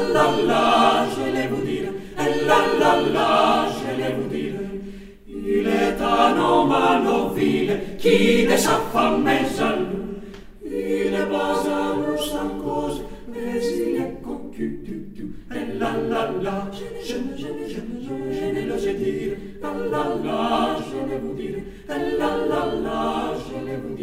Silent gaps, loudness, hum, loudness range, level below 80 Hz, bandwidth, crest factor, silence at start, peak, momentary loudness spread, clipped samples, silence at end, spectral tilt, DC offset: none; -22 LUFS; none; 9 LU; -44 dBFS; 16 kHz; 20 dB; 0 s; -2 dBFS; 14 LU; under 0.1%; 0 s; -5 dB/octave; under 0.1%